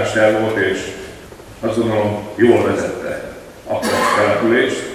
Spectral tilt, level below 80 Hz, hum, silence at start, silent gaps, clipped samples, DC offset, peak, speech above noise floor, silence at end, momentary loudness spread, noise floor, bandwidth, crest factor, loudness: -5 dB/octave; -48 dBFS; none; 0 s; none; under 0.1%; under 0.1%; 0 dBFS; 21 dB; 0 s; 18 LU; -36 dBFS; 15.5 kHz; 18 dB; -17 LUFS